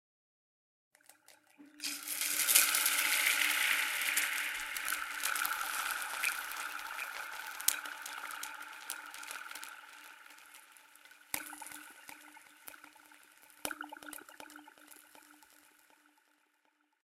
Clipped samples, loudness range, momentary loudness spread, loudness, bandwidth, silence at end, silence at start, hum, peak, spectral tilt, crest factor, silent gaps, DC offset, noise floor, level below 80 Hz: under 0.1%; 19 LU; 24 LU; -33 LUFS; 16.5 kHz; 1.85 s; 1.6 s; none; -4 dBFS; 2.5 dB/octave; 34 dB; none; under 0.1%; -76 dBFS; -78 dBFS